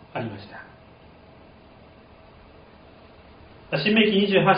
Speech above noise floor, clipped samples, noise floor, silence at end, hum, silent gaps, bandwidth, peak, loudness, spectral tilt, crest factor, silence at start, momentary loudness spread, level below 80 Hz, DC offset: 29 dB; under 0.1%; -50 dBFS; 0 s; none; none; 5.2 kHz; -4 dBFS; -22 LUFS; -3.5 dB/octave; 22 dB; 0.15 s; 24 LU; -58 dBFS; under 0.1%